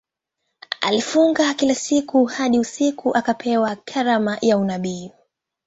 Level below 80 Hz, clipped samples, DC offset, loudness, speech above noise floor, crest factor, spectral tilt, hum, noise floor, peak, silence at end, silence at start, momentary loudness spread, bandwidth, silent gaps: -62 dBFS; under 0.1%; under 0.1%; -20 LUFS; 58 dB; 20 dB; -4 dB/octave; none; -77 dBFS; 0 dBFS; 0.55 s; 0.7 s; 7 LU; 8 kHz; none